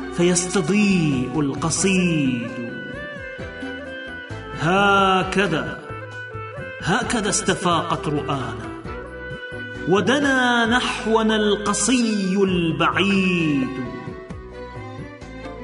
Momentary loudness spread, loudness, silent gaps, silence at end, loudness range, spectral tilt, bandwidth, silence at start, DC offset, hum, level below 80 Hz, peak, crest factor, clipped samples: 16 LU; -20 LUFS; none; 0 s; 5 LU; -4.5 dB/octave; 11 kHz; 0 s; under 0.1%; none; -44 dBFS; -4 dBFS; 16 dB; under 0.1%